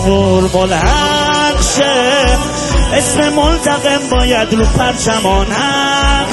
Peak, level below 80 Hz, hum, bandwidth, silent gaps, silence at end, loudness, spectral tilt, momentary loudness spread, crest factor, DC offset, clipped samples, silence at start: 0 dBFS; -18 dBFS; none; 12.5 kHz; none; 0 s; -11 LUFS; -4 dB/octave; 2 LU; 12 dB; under 0.1%; under 0.1%; 0 s